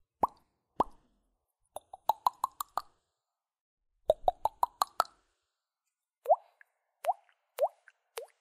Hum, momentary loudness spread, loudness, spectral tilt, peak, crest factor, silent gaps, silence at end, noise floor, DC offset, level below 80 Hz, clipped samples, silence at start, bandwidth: none; 17 LU; -34 LUFS; -3 dB/octave; -8 dBFS; 28 dB; 3.61-3.77 s; 0.15 s; -90 dBFS; under 0.1%; -62 dBFS; under 0.1%; 0.25 s; 15.5 kHz